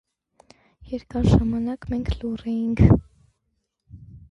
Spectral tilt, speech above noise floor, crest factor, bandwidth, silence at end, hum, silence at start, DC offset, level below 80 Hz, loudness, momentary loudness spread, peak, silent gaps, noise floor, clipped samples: -9 dB/octave; 54 dB; 24 dB; 8.4 kHz; 0.15 s; none; 0.85 s; under 0.1%; -32 dBFS; -22 LUFS; 12 LU; 0 dBFS; none; -75 dBFS; under 0.1%